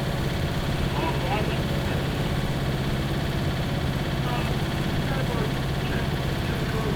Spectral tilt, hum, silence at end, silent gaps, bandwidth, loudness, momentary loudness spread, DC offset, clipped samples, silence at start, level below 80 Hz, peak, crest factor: -6 dB/octave; 50 Hz at -40 dBFS; 0 s; none; 19.5 kHz; -26 LUFS; 1 LU; under 0.1%; under 0.1%; 0 s; -34 dBFS; -14 dBFS; 12 dB